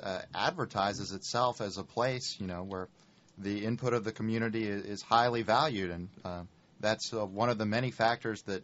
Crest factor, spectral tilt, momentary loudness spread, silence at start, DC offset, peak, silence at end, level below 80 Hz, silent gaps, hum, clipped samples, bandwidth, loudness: 22 dB; -4 dB/octave; 13 LU; 0 s; under 0.1%; -10 dBFS; 0 s; -66 dBFS; none; none; under 0.1%; 8 kHz; -33 LUFS